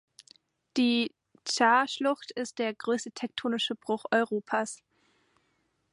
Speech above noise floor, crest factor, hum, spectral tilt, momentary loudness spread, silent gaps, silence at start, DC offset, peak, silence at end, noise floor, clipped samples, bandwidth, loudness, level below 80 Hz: 46 dB; 20 dB; none; -3 dB/octave; 12 LU; none; 0.75 s; under 0.1%; -10 dBFS; 1.15 s; -74 dBFS; under 0.1%; 11.5 kHz; -29 LUFS; -80 dBFS